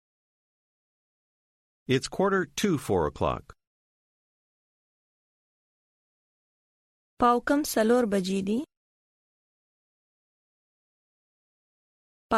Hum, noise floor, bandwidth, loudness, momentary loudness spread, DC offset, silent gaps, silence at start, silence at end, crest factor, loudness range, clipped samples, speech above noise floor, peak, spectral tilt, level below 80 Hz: none; under -90 dBFS; 15.5 kHz; -26 LUFS; 8 LU; under 0.1%; 3.67-7.17 s, 8.77-12.29 s; 1.9 s; 0 s; 22 dB; 8 LU; under 0.1%; over 64 dB; -10 dBFS; -5 dB/octave; -56 dBFS